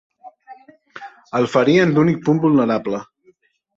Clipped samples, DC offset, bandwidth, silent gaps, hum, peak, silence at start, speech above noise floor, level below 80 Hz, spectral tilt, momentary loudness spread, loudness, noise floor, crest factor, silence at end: under 0.1%; under 0.1%; 7.8 kHz; none; none; -2 dBFS; 0.25 s; 41 dB; -58 dBFS; -7.5 dB/octave; 22 LU; -17 LUFS; -57 dBFS; 16 dB; 0.75 s